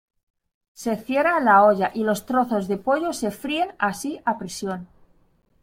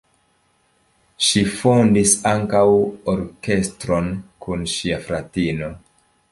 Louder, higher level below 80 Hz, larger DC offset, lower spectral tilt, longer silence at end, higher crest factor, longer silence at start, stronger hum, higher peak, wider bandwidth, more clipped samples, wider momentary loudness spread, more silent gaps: second, -22 LUFS vs -19 LUFS; second, -60 dBFS vs -44 dBFS; neither; about the same, -5 dB/octave vs -4.5 dB/octave; first, 0.8 s vs 0.55 s; about the same, 18 dB vs 18 dB; second, 0.8 s vs 1.2 s; neither; about the same, -4 dBFS vs -2 dBFS; first, 16.5 kHz vs 11.5 kHz; neither; about the same, 14 LU vs 12 LU; neither